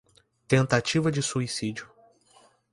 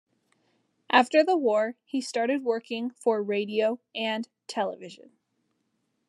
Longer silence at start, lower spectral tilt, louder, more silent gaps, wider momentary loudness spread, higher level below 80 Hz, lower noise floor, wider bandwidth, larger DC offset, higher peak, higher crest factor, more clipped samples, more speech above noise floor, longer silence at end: second, 0.5 s vs 0.9 s; about the same, -5 dB/octave vs -4 dB/octave; about the same, -26 LUFS vs -27 LUFS; neither; about the same, 10 LU vs 11 LU; first, -62 dBFS vs under -90 dBFS; second, -60 dBFS vs -76 dBFS; about the same, 11.5 kHz vs 11.5 kHz; neither; about the same, -6 dBFS vs -4 dBFS; about the same, 22 dB vs 24 dB; neither; second, 35 dB vs 49 dB; second, 0.9 s vs 1.05 s